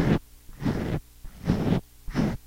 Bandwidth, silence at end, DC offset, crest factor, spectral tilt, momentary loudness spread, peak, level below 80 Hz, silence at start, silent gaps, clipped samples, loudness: 16 kHz; 0 s; under 0.1%; 20 dB; -7.5 dB/octave; 9 LU; -8 dBFS; -40 dBFS; 0 s; none; under 0.1%; -29 LUFS